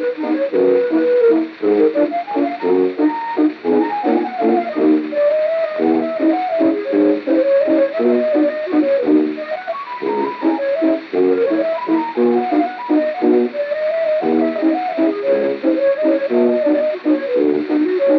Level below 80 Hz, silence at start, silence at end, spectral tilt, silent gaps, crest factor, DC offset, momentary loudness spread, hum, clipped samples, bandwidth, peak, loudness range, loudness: -78 dBFS; 0 s; 0 s; -8 dB/octave; none; 12 dB; under 0.1%; 4 LU; none; under 0.1%; 5.6 kHz; -4 dBFS; 2 LU; -16 LUFS